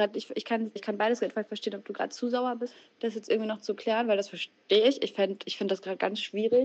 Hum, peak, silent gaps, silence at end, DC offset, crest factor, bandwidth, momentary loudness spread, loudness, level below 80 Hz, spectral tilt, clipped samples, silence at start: none; -10 dBFS; none; 0 s; under 0.1%; 18 dB; 8.2 kHz; 10 LU; -30 LUFS; -84 dBFS; -4.5 dB/octave; under 0.1%; 0 s